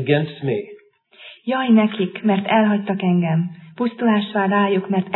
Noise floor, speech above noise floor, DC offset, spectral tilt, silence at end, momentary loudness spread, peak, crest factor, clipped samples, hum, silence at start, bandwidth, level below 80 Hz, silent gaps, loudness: -48 dBFS; 30 dB; under 0.1%; -11 dB/octave; 0 s; 9 LU; -4 dBFS; 16 dB; under 0.1%; none; 0 s; 4.2 kHz; -72 dBFS; none; -19 LUFS